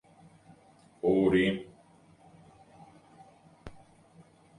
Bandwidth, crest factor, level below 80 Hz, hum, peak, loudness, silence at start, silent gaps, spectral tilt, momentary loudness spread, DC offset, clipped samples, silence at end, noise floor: 10.5 kHz; 20 dB; -60 dBFS; none; -14 dBFS; -28 LUFS; 1.05 s; none; -7 dB/octave; 28 LU; under 0.1%; under 0.1%; 0.9 s; -60 dBFS